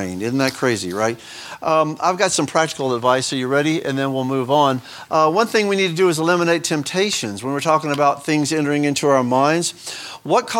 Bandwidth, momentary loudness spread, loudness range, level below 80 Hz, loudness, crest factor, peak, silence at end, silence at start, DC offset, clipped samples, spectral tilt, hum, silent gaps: 17.5 kHz; 6 LU; 1 LU; -64 dBFS; -18 LUFS; 18 dB; 0 dBFS; 0 s; 0 s; under 0.1%; under 0.1%; -4 dB/octave; none; none